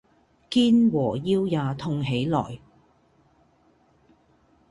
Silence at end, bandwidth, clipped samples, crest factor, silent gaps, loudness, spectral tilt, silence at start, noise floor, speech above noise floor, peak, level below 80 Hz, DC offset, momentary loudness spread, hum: 2.15 s; 11 kHz; under 0.1%; 16 dB; none; -23 LUFS; -7.5 dB/octave; 0.5 s; -62 dBFS; 39 dB; -10 dBFS; -58 dBFS; under 0.1%; 9 LU; none